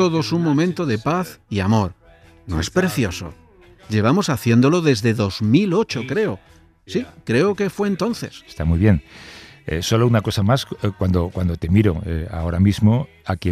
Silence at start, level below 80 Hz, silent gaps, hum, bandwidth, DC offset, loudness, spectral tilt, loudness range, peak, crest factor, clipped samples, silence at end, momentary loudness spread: 0 s; -38 dBFS; none; none; 15 kHz; under 0.1%; -20 LUFS; -6.5 dB/octave; 3 LU; -4 dBFS; 16 dB; under 0.1%; 0 s; 11 LU